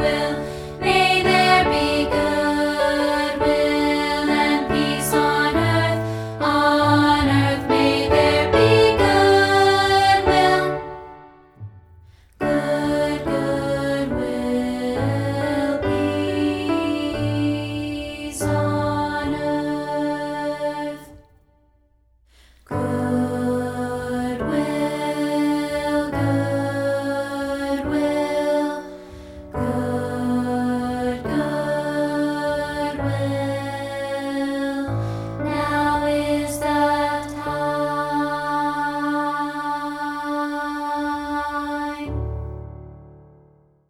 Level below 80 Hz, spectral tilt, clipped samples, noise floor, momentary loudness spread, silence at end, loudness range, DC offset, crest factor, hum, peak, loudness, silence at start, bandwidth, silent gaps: -42 dBFS; -5.5 dB/octave; under 0.1%; -59 dBFS; 11 LU; 0.75 s; 9 LU; under 0.1%; 18 dB; none; -2 dBFS; -21 LUFS; 0 s; 16 kHz; none